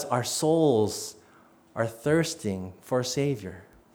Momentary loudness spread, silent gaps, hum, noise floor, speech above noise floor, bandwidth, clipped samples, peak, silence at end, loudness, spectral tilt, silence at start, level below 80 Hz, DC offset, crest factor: 14 LU; none; none; -57 dBFS; 31 dB; over 20 kHz; under 0.1%; -10 dBFS; 0.3 s; -27 LUFS; -5 dB/octave; 0 s; -64 dBFS; under 0.1%; 18 dB